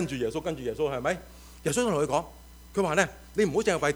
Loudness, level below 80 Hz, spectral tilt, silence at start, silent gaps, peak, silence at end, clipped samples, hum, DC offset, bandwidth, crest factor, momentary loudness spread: -28 LUFS; -50 dBFS; -4.5 dB/octave; 0 s; none; -6 dBFS; 0 s; under 0.1%; none; under 0.1%; over 20 kHz; 22 dB; 9 LU